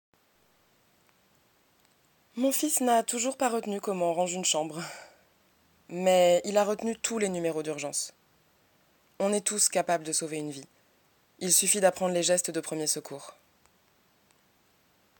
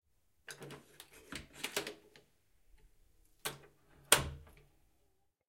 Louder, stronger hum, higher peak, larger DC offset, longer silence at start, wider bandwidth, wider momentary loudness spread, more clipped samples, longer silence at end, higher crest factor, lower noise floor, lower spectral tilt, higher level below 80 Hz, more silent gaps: first, -27 LUFS vs -35 LUFS; neither; about the same, -8 dBFS vs -8 dBFS; neither; first, 2.35 s vs 0.5 s; about the same, 17.5 kHz vs 16.5 kHz; second, 16 LU vs 27 LU; neither; first, 1.9 s vs 1.05 s; second, 22 dB vs 36 dB; second, -67 dBFS vs -77 dBFS; first, -2.5 dB/octave vs -1 dB/octave; second, -78 dBFS vs -62 dBFS; neither